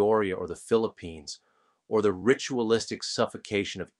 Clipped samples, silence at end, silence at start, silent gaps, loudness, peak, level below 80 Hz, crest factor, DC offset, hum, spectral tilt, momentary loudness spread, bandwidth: under 0.1%; 0.15 s; 0 s; none; -28 LUFS; -8 dBFS; -62 dBFS; 20 dB; under 0.1%; none; -4.5 dB/octave; 15 LU; 11.5 kHz